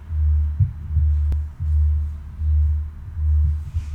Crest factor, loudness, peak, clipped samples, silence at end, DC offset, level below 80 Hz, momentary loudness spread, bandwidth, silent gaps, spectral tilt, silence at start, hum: 12 dB; -22 LUFS; -8 dBFS; under 0.1%; 0 s; under 0.1%; -24 dBFS; 7 LU; 1.9 kHz; none; -9.5 dB/octave; 0 s; none